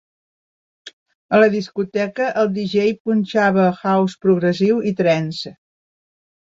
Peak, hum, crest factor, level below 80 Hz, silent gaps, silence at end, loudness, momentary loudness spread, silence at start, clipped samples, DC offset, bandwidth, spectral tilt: -2 dBFS; none; 16 dB; -62 dBFS; 0.93-1.06 s, 1.15-1.29 s, 3.00-3.05 s; 1.05 s; -18 LUFS; 8 LU; 0.85 s; under 0.1%; under 0.1%; 7.6 kHz; -7 dB/octave